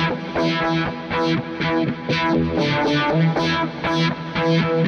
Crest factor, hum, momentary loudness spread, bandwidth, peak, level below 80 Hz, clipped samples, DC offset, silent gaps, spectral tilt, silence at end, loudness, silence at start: 12 dB; none; 4 LU; 6.8 kHz; -8 dBFS; -46 dBFS; under 0.1%; under 0.1%; none; -6.5 dB/octave; 0 s; -20 LUFS; 0 s